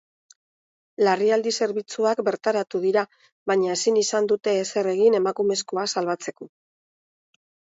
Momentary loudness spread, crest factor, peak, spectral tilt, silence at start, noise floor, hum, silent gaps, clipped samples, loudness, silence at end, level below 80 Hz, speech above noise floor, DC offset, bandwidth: 7 LU; 16 dB; -8 dBFS; -3.5 dB/octave; 1 s; under -90 dBFS; none; 3.32-3.46 s; under 0.1%; -23 LUFS; 1.3 s; -74 dBFS; over 68 dB; under 0.1%; 8 kHz